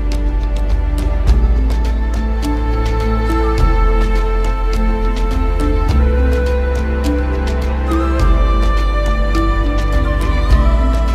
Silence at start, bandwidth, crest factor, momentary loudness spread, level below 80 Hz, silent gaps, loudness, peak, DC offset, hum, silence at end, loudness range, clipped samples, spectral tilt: 0 s; 9.6 kHz; 12 dB; 4 LU; -14 dBFS; none; -16 LUFS; 0 dBFS; under 0.1%; none; 0 s; 1 LU; under 0.1%; -7 dB/octave